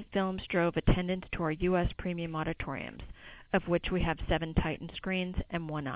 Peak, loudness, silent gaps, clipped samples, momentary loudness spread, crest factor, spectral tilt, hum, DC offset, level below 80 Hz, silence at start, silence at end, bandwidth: -12 dBFS; -33 LUFS; none; under 0.1%; 8 LU; 20 dB; -5 dB/octave; none; under 0.1%; -42 dBFS; 0 s; 0 s; 4 kHz